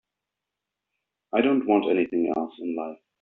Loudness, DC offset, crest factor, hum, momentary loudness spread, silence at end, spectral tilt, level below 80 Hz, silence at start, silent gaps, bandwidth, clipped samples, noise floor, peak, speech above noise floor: -25 LUFS; under 0.1%; 20 dB; none; 10 LU; 0.25 s; -4 dB/octave; -72 dBFS; 1.35 s; none; 4.1 kHz; under 0.1%; -86 dBFS; -8 dBFS; 62 dB